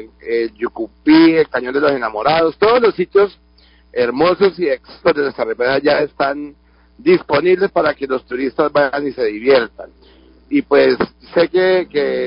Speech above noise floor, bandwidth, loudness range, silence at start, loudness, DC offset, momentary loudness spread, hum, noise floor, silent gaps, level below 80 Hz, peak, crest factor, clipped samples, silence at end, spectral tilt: 34 dB; 5.4 kHz; 3 LU; 0 s; -15 LUFS; under 0.1%; 8 LU; none; -49 dBFS; none; -50 dBFS; -2 dBFS; 14 dB; under 0.1%; 0 s; -10 dB/octave